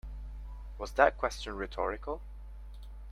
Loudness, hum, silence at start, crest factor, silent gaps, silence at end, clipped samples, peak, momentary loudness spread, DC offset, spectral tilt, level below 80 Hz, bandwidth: -32 LUFS; none; 0.05 s; 26 dB; none; 0 s; under 0.1%; -8 dBFS; 22 LU; under 0.1%; -4.5 dB/octave; -44 dBFS; 13 kHz